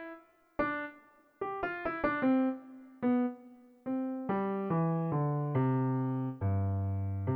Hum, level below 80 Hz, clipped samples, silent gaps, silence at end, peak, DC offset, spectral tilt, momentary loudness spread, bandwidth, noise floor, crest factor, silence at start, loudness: none; -64 dBFS; under 0.1%; none; 0 s; -18 dBFS; under 0.1%; -11 dB/octave; 14 LU; 4.9 kHz; -60 dBFS; 14 dB; 0 s; -33 LUFS